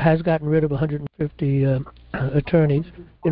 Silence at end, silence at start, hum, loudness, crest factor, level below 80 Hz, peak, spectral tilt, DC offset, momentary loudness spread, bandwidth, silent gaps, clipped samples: 0 s; 0 s; none; -22 LUFS; 18 dB; -44 dBFS; -4 dBFS; -13 dB/octave; under 0.1%; 9 LU; 4.9 kHz; none; under 0.1%